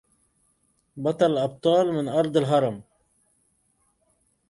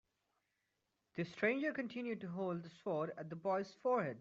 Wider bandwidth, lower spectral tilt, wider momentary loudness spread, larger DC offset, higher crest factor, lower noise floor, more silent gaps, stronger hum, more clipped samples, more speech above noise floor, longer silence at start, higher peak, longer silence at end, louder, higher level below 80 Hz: first, 11.5 kHz vs 7.6 kHz; first, -7 dB/octave vs -5.5 dB/octave; about the same, 8 LU vs 8 LU; neither; about the same, 18 dB vs 20 dB; second, -69 dBFS vs -86 dBFS; neither; neither; neither; about the same, 46 dB vs 46 dB; second, 0.95 s vs 1.15 s; first, -8 dBFS vs -22 dBFS; first, 1.7 s vs 0 s; first, -23 LUFS vs -40 LUFS; first, -66 dBFS vs -84 dBFS